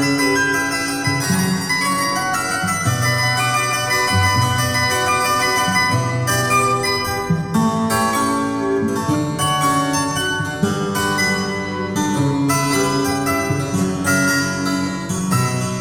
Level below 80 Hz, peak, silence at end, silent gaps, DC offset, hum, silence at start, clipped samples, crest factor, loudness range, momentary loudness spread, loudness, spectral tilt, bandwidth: -46 dBFS; -4 dBFS; 0 s; none; under 0.1%; none; 0 s; under 0.1%; 14 dB; 2 LU; 4 LU; -18 LUFS; -4 dB/octave; over 20 kHz